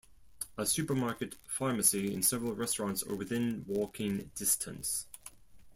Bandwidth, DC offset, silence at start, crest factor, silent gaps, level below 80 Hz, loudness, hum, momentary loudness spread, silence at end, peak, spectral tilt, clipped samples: 16.5 kHz; under 0.1%; 0.1 s; 22 dB; none; -62 dBFS; -33 LUFS; none; 13 LU; 0 s; -12 dBFS; -3.5 dB/octave; under 0.1%